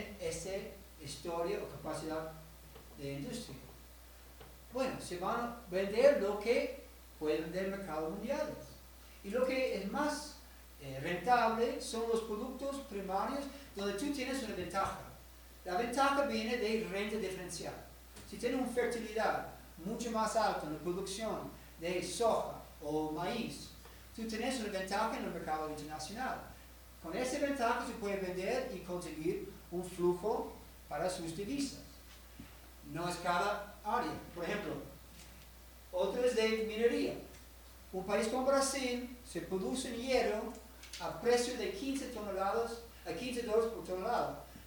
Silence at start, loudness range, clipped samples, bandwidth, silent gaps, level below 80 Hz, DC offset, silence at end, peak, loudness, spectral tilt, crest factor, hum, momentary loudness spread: 0 s; 5 LU; under 0.1%; over 20 kHz; none; -58 dBFS; under 0.1%; 0 s; -14 dBFS; -37 LUFS; -4 dB/octave; 22 dB; none; 20 LU